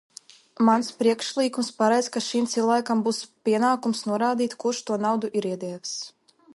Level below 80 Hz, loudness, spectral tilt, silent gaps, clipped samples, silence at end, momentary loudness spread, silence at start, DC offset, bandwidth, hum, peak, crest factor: -74 dBFS; -24 LUFS; -4 dB/octave; none; under 0.1%; 0.45 s; 9 LU; 0.6 s; under 0.1%; 11.5 kHz; none; -6 dBFS; 18 dB